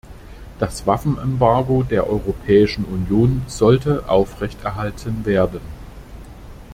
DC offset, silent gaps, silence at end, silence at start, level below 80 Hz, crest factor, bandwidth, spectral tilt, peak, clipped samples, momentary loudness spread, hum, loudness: under 0.1%; none; 0 s; 0.05 s; -36 dBFS; 16 dB; 15.5 kHz; -7.5 dB/octave; -2 dBFS; under 0.1%; 19 LU; none; -19 LUFS